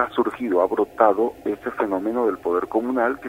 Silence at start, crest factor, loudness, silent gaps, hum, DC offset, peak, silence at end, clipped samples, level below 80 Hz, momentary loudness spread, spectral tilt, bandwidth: 0 s; 20 dB; -22 LUFS; none; none; under 0.1%; -2 dBFS; 0 s; under 0.1%; -58 dBFS; 6 LU; -6.5 dB/octave; 16 kHz